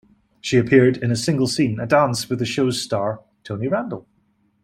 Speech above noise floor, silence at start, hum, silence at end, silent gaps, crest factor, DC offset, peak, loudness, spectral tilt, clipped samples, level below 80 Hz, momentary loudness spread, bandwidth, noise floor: 44 dB; 0.45 s; none; 0.65 s; none; 18 dB; under 0.1%; -2 dBFS; -20 LUFS; -5.5 dB/octave; under 0.1%; -56 dBFS; 16 LU; 16 kHz; -63 dBFS